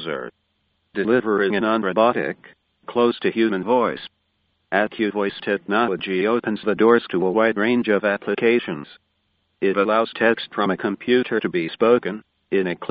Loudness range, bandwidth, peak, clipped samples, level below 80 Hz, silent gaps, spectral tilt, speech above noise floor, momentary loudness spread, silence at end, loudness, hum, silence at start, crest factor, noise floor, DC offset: 3 LU; 5 kHz; -2 dBFS; under 0.1%; -64 dBFS; none; -3.5 dB/octave; 49 dB; 10 LU; 0 s; -21 LUFS; none; 0 s; 20 dB; -69 dBFS; under 0.1%